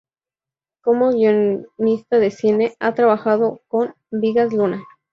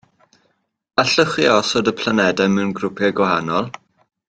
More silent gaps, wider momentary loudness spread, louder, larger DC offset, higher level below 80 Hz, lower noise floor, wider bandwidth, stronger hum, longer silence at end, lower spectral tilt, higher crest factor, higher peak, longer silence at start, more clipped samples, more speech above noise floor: neither; about the same, 7 LU vs 7 LU; about the same, -18 LUFS vs -17 LUFS; neither; second, -64 dBFS vs -56 dBFS; first, under -90 dBFS vs -66 dBFS; second, 7 kHz vs 9.2 kHz; neither; second, 0.3 s vs 0.6 s; first, -7.5 dB/octave vs -4.5 dB/octave; about the same, 16 dB vs 18 dB; about the same, -4 dBFS vs -2 dBFS; about the same, 0.85 s vs 0.95 s; neither; first, over 73 dB vs 48 dB